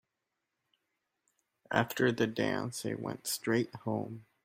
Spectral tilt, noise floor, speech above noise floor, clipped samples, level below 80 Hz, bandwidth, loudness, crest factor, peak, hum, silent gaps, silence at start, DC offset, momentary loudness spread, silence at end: -4.5 dB/octave; -86 dBFS; 53 dB; under 0.1%; -72 dBFS; 16 kHz; -33 LUFS; 24 dB; -10 dBFS; none; none; 1.7 s; under 0.1%; 8 LU; 0.25 s